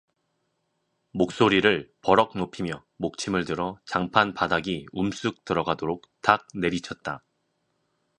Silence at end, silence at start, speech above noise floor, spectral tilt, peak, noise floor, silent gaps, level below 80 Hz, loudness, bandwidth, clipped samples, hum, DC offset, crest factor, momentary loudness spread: 1 s; 1.15 s; 50 dB; -5 dB/octave; -2 dBFS; -75 dBFS; none; -56 dBFS; -25 LUFS; 10.5 kHz; under 0.1%; none; under 0.1%; 24 dB; 12 LU